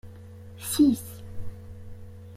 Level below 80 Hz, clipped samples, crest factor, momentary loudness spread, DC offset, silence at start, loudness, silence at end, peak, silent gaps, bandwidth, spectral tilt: -50 dBFS; under 0.1%; 18 dB; 24 LU; under 0.1%; 0.05 s; -25 LUFS; 0 s; -10 dBFS; none; 15.5 kHz; -5 dB/octave